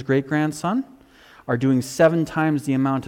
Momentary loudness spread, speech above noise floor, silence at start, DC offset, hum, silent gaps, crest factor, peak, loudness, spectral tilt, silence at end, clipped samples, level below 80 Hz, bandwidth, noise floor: 9 LU; 29 dB; 0 s; under 0.1%; none; none; 16 dB; -6 dBFS; -21 LUFS; -6.5 dB/octave; 0 s; under 0.1%; -58 dBFS; 16.5 kHz; -50 dBFS